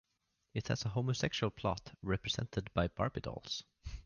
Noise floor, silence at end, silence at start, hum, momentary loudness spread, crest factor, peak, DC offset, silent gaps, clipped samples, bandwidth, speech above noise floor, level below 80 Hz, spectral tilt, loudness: -82 dBFS; 0.05 s; 0.55 s; none; 8 LU; 20 dB; -18 dBFS; under 0.1%; none; under 0.1%; 7.4 kHz; 45 dB; -52 dBFS; -5 dB/octave; -38 LUFS